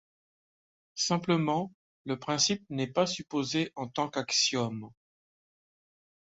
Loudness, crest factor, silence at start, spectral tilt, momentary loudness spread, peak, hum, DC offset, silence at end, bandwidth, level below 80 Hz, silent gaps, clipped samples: -30 LUFS; 20 dB; 0.95 s; -3.5 dB/octave; 11 LU; -12 dBFS; none; under 0.1%; 1.3 s; 8 kHz; -70 dBFS; 1.75-2.05 s; under 0.1%